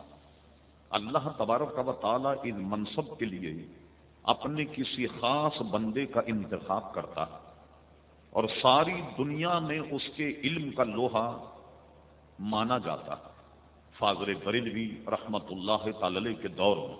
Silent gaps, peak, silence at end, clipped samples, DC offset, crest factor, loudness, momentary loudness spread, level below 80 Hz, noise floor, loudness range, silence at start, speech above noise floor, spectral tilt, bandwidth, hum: none; -6 dBFS; 0 s; under 0.1%; under 0.1%; 26 dB; -31 LUFS; 9 LU; -62 dBFS; -59 dBFS; 4 LU; 0 s; 28 dB; -3.5 dB/octave; 4 kHz; none